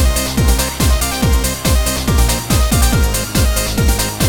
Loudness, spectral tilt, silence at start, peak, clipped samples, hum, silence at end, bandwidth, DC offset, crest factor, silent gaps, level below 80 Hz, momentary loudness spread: -15 LUFS; -4 dB/octave; 0 s; 0 dBFS; under 0.1%; none; 0 s; 20 kHz; under 0.1%; 14 dB; none; -16 dBFS; 2 LU